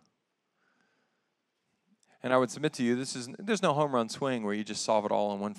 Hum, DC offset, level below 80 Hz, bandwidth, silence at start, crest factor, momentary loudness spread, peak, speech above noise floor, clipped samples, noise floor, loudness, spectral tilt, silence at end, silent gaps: none; under 0.1%; -86 dBFS; 13 kHz; 2.25 s; 22 dB; 6 LU; -10 dBFS; 50 dB; under 0.1%; -80 dBFS; -30 LUFS; -4.5 dB/octave; 0 s; none